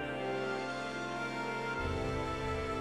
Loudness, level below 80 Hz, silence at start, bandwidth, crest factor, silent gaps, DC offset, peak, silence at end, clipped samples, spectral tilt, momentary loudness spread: -37 LUFS; -50 dBFS; 0 s; 14.5 kHz; 12 dB; none; under 0.1%; -24 dBFS; 0 s; under 0.1%; -5.5 dB/octave; 2 LU